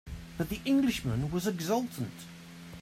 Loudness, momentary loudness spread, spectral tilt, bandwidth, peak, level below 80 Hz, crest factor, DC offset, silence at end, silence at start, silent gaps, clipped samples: -32 LUFS; 19 LU; -5.5 dB/octave; 16 kHz; -16 dBFS; -52 dBFS; 16 dB; under 0.1%; 0 s; 0.05 s; none; under 0.1%